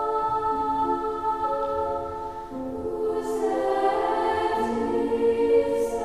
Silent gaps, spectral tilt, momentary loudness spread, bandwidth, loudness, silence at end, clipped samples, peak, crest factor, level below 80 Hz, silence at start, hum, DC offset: none; -5.5 dB/octave; 9 LU; 13.5 kHz; -25 LUFS; 0 s; under 0.1%; -10 dBFS; 14 dB; -50 dBFS; 0 s; none; 0.3%